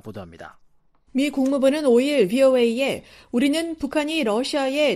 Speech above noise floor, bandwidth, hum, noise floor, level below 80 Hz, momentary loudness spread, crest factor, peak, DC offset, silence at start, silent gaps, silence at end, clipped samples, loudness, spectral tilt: 36 dB; 15 kHz; none; -57 dBFS; -56 dBFS; 12 LU; 14 dB; -6 dBFS; under 0.1%; 0.05 s; none; 0 s; under 0.1%; -21 LUFS; -4.5 dB/octave